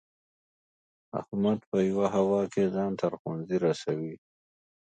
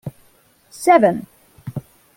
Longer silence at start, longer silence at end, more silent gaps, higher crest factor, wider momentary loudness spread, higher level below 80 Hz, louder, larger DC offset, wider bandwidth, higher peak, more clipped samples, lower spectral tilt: first, 1.15 s vs 0.05 s; first, 0.75 s vs 0.35 s; first, 1.67-1.72 s, 3.19-3.25 s vs none; about the same, 18 dB vs 20 dB; second, 10 LU vs 22 LU; second, -66 dBFS vs -58 dBFS; second, -29 LUFS vs -16 LUFS; neither; second, 9 kHz vs 17 kHz; second, -12 dBFS vs -2 dBFS; neither; first, -7.5 dB/octave vs -6 dB/octave